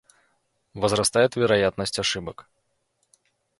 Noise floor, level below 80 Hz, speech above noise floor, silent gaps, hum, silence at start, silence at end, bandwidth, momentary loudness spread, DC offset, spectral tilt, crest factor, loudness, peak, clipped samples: -73 dBFS; -54 dBFS; 50 dB; none; none; 0.75 s; 1.2 s; 12 kHz; 13 LU; under 0.1%; -3.5 dB/octave; 20 dB; -23 LUFS; -6 dBFS; under 0.1%